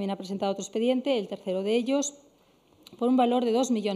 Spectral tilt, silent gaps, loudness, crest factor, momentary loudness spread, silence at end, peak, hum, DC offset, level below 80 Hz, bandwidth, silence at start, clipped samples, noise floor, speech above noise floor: -4.5 dB/octave; none; -27 LUFS; 16 dB; 7 LU; 0 s; -12 dBFS; none; under 0.1%; -78 dBFS; 14 kHz; 0 s; under 0.1%; -62 dBFS; 35 dB